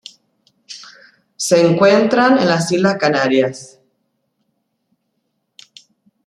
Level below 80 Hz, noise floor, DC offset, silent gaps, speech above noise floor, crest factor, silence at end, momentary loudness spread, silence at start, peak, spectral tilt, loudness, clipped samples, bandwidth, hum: -62 dBFS; -70 dBFS; under 0.1%; none; 57 dB; 16 dB; 2.6 s; 23 LU; 0.7 s; 0 dBFS; -5 dB/octave; -14 LUFS; under 0.1%; 15 kHz; none